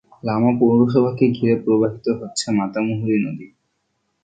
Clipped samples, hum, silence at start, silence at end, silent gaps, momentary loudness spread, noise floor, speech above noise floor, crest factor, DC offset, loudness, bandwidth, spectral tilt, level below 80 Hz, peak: under 0.1%; none; 0.25 s; 0.8 s; none; 9 LU; -71 dBFS; 53 dB; 16 dB; under 0.1%; -19 LUFS; 9.2 kHz; -6.5 dB/octave; -56 dBFS; -2 dBFS